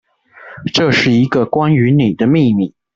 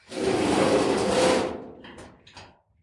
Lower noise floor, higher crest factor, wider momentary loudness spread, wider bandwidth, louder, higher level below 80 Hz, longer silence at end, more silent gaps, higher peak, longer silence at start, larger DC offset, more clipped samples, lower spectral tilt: second, -39 dBFS vs -50 dBFS; second, 12 dB vs 18 dB; second, 6 LU vs 22 LU; second, 7.6 kHz vs 11.5 kHz; first, -13 LUFS vs -23 LUFS; about the same, -50 dBFS vs -54 dBFS; about the same, 0.25 s vs 0.35 s; neither; first, -2 dBFS vs -8 dBFS; first, 0.45 s vs 0.1 s; neither; neither; first, -6.5 dB/octave vs -4.5 dB/octave